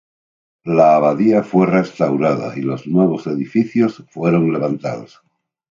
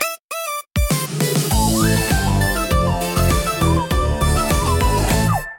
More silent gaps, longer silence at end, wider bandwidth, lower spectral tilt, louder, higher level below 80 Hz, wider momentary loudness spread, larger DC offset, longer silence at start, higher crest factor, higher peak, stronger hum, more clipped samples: second, none vs 0.20-0.28 s; first, 0.7 s vs 0 s; second, 7.4 kHz vs 17 kHz; first, -9 dB/octave vs -4.5 dB/octave; about the same, -16 LUFS vs -18 LUFS; second, -62 dBFS vs -24 dBFS; first, 10 LU vs 5 LU; neither; first, 0.65 s vs 0 s; about the same, 16 dB vs 16 dB; about the same, 0 dBFS vs 0 dBFS; neither; neither